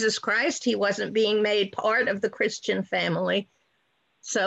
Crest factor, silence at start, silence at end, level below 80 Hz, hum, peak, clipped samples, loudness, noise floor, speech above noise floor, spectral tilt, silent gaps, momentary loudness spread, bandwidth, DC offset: 14 dB; 0 s; 0 s; -70 dBFS; none; -12 dBFS; under 0.1%; -25 LUFS; -71 dBFS; 46 dB; -3.5 dB/octave; none; 5 LU; 8.8 kHz; under 0.1%